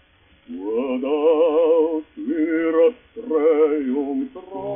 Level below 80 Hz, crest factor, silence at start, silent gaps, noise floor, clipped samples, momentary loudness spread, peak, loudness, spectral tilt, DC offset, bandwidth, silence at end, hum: -62 dBFS; 14 dB; 0.5 s; none; -51 dBFS; under 0.1%; 14 LU; -6 dBFS; -20 LUFS; -4 dB/octave; under 0.1%; 3.6 kHz; 0 s; none